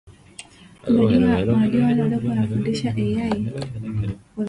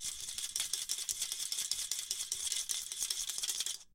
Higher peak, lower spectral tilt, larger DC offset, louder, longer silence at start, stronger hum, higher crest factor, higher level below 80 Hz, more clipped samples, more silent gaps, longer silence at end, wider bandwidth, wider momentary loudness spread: first, -4 dBFS vs -14 dBFS; first, -8 dB/octave vs 3 dB/octave; neither; first, -21 LUFS vs -35 LUFS; about the same, 0.05 s vs 0 s; neither; second, 16 dB vs 24 dB; first, -44 dBFS vs -68 dBFS; neither; neither; about the same, 0 s vs 0.05 s; second, 11 kHz vs 17 kHz; first, 14 LU vs 2 LU